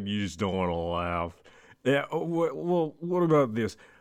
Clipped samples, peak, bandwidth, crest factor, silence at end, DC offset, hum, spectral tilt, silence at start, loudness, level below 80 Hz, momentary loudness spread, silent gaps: under 0.1%; -12 dBFS; 14.5 kHz; 16 dB; 0.25 s; under 0.1%; none; -6.5 dB/octave; 0 s; -28 LUFS; -54 dBFS; 9 LU; none